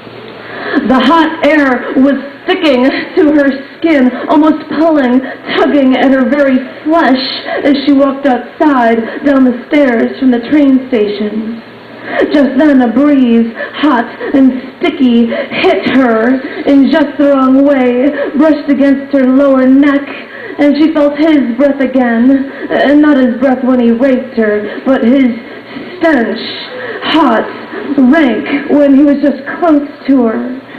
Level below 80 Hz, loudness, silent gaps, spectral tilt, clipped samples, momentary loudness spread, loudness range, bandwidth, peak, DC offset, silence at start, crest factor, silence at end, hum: -46 dBFS; -9 LUFS; none; -6.5 dB/octave; under 0.1%; 8 LU; 2 LU; 6 kHz; 0 dBFS; under 0.1%; 0 s; 8 dB; 0 s; none